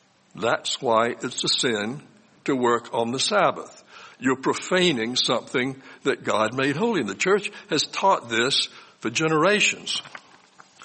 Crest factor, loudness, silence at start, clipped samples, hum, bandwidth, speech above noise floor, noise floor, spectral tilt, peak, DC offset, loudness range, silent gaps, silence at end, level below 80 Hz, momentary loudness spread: 18 dB; -23 LUFS; 0.35 s; under 0.1%; none; 8.8 kHz; 29 dB; -53 dBFS; -3 dB/octave; -6 dBFS; under 0.1%; 2 LU; none; 0 s; -68 dBFS; 9 LU